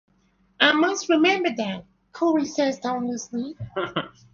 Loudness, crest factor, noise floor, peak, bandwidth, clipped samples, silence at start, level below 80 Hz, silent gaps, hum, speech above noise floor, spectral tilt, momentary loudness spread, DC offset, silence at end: -23 LUFS; 22 dB; -63 dBFS; -2 dBFS; 7.4 kHz; under 0.1%; 0.6 s; -62 dBFS; none; none; 40 dB; -3.5 dB/octave; 13 LU; under 0.1%; 0.25 s